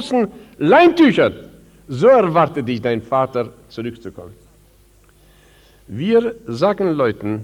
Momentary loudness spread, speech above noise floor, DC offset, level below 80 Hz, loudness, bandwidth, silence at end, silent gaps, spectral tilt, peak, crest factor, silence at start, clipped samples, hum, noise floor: 18 LU; 35 dB; under 0.1%; -52 dBFS; -16 LUFS; 12.5 kHz; 0 s; none; -7 dB/octave; -2 dBFS; 16 dB; 0 s; under 0.1%; 50 Hz at -50 dBFS; -51 dBFS